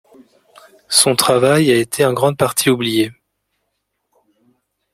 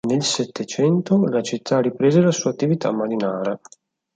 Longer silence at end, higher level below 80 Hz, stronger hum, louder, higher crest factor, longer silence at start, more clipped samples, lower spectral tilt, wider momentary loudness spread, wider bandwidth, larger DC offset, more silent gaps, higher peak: first, 1.8 s vs 0.6 s; first, -58 dBFS vs -64 dBFS; neither; first, -14 LUFS vs -20 LUFS; about the same, 18 dB vs 16 dB; first, 0.9 s vs 0.05 s; neither; second, -3.5 dB/octave vs -5.5 dB/octave; second, 5 LU vs 8 LU; first, 16.5 kHz vs 9.4 kHz; neither; neither; first, 0 dBFS vs -4 dBFS